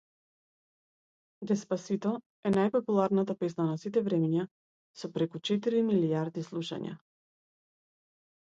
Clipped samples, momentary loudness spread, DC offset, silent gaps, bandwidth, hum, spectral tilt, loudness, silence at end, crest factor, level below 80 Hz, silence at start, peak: under 0.1%; 12 LU; under 0.1%; 2.26-2.43 s, 4.51-4.94 s; 7.8 kHz; none; -7 dB/octave; -31 LUFS; 1.5 s; 16 dB; -74 dBFS; 1.4 s; -16 dBFS